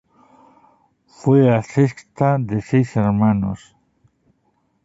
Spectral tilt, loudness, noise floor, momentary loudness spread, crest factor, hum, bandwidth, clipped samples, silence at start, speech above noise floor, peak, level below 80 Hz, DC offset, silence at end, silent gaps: -9 dB/octave; -18 LUFS; -65 dBFS; 9 LU; 18 dB; none; 8 kHz; under 0.1%; 1.25 s; 48 dB; -2 dBFS; -50 dBFS; under 0.1%; 1.3 s; none